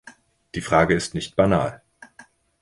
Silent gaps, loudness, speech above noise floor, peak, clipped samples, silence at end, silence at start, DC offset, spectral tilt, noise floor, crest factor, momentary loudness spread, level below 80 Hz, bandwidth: none; -21 LUFS; 31 dB; -2 dBFS; under 0.1%; 0.4 s; 0.05 s; under 0.1%; -5.5 dB/octave; -52 dBFS; 20 dB; 13 LU; -46 dBFS; 11.5 kHz